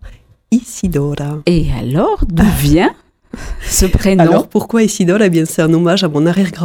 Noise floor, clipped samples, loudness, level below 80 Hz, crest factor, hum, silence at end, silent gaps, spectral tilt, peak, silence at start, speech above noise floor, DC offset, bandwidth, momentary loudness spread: -37 dBFS; under 0.1%; -13 LUFS; -24 dBFS; 12 dB; none; 0 s; none; -5.5 dB/octave; 0 dBFS; 0.05 s; 25 dB; under 0.1%; 17.5 kHz; 7 LU